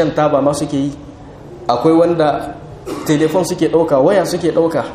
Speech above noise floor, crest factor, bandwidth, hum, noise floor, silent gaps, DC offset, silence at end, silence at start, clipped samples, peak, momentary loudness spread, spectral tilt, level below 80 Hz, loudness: 20 dB; 14 dB; 15.5 kHz; none; -34 dBFS; none; under 0.1%; 0 s; 0 s; under 0.1%; 0 dBFS; 16 LU; -6 dB/octave; -44 dBFS; -15 LUFS